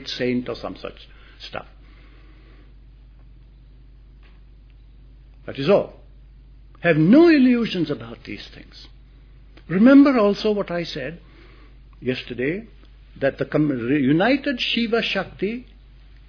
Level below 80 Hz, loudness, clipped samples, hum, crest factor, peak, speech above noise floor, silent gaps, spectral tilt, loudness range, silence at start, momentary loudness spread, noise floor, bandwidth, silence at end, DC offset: -46 dBFS; -19 LUFS; under 0.1%; none; 18 dB; -4 dBFS; 27 dB; none; -7 dB/octave; 9 LU; 0 s; 22 LU; -46 dBFS; 5.4 kHz; 0.65 s; under 0.1%